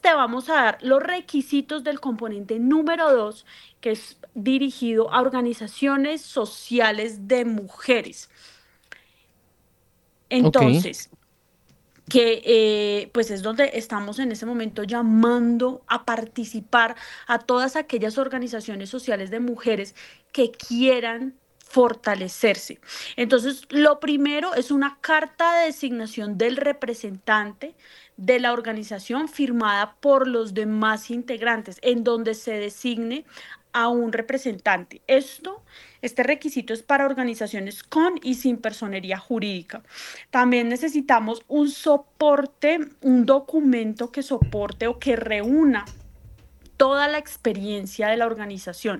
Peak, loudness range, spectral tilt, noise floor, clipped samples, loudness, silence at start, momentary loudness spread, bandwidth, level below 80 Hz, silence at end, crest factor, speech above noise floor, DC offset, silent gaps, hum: 0 dBFS; 4 LU; -5 dB/octave; -63 dBFS; under 0.1%; -22 LUFS; 0.05 s; 12 LU; 12.5 kHz; -52 dBFS; 0 s; 22 dB; 41 dB; under 0.1%; none; none